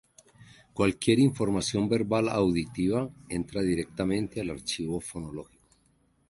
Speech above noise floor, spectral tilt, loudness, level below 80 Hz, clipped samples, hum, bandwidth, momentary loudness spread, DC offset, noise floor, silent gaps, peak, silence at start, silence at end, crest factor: 40 dB; -5.5 dB/octave; -28 LUFS; -52 dBFS; under 0.1%; none; 11.5 kHz; 12 LU; under 0.1%; -67 dBFS; none; -8 dBFS; 0.4 s; 0.85 s; 20 dB